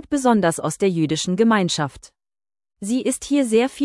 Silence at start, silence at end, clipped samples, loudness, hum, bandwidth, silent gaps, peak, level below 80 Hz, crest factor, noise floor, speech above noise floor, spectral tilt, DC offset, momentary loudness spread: 0.1 s; 0 s; under 0.1%; -20 LUFS; none; 12 kHz; none; -4 dBFS; -54 dBFS; 16 dB; under -90 dBFS; over 71 dB; -5 dB/octave; under 0.1%; 7 LU